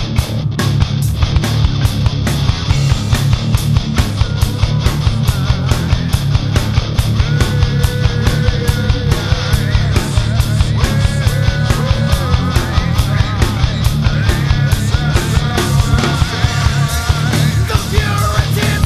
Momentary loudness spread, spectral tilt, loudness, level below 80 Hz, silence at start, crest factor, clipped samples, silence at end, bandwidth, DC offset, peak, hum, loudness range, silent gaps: 2 LU; -5.5 dB/octave; -14 LUFS; -20 dBFS; 0 s; 12 dB; under 0.1%; 0 s; 14 kHz; 0.4%; 0 dBFS; none; 1 LU; none